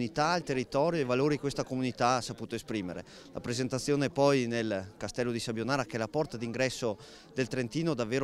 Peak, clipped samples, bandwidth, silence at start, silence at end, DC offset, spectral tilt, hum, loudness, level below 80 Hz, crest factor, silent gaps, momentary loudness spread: -12 dBFS; under 0.1%; 15 kHz; 0 s; 0 s; under 0.1%; -5 dB/octave; none; -32 LUFS; -60 dBFS; 20 dB; none; 10 LU